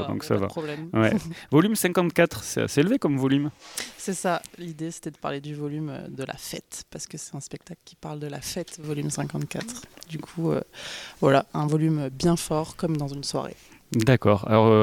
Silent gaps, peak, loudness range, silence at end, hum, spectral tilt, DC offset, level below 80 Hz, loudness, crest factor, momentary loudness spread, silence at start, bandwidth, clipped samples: none; -4 dBFS; 11 LU; 0 s; none; -5.5 dB/octave; under 0.1%; -56 dBFS; -26 LUFS; 22 dB; 15 LU; 0 s; 18.5 kHz; under 0.1%